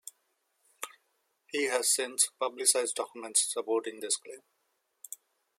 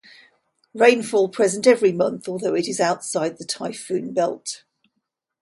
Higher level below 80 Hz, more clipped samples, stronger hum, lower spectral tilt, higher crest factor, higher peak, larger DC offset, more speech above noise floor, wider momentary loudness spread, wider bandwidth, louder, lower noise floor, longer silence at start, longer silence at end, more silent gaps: second, under -90 dBFS vs -70 dBFS; neither; neither; second, 1 dB/octave vs -4 dB/octave; about the same, 24 dB vs 20 dB; second, -10 dBFS vs -2 dBFS; neither; second, 47 dB vs 57 dB; first, 20 LU vs 12 LU; first, 16.5 kHz vs 11.5 kHz; second, -29 LUFS vs -21 LUFS; about the same, -78 dBFS vs -78 dBFS; second, 0.05 s vs 0.75 s; second, 0.45 s vs 0.85 s; neither